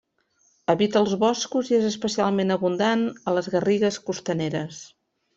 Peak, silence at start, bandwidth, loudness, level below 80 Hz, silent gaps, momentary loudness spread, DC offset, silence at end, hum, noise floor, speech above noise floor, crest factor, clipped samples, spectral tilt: -6 dBFS; 0.7 s; 8 kHz; -23 LUFS; -64 dBFS; none; 8 LU; under 0.1%; 0.5 s; none; -66 dBFS; 43 dB; 18 dB; under 0.1%; -5 dB/octave